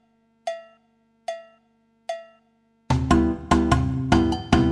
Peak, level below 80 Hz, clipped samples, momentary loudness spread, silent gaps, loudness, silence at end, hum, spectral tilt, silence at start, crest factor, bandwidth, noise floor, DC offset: -4 dBFS; -34 dBFS; under 0.1%; 18 LU; none; -22 LUFS; 0 s; 50 Hz at -50 dBFS; -6.5 dB/octave; 0.45 s; 20 dB; 11 kHz; -64 dBFS; under 0.1%